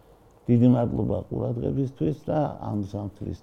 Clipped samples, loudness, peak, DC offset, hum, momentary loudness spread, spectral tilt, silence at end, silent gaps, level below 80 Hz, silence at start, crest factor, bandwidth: under 0.1%; -26 LUFS; -8 dBFS; under 0.1%; none; 14 LU; -10.5 dB/octave; 0.05 s; none; -48 dBFS; 0.5 s; 18 dB; 6.4 kHz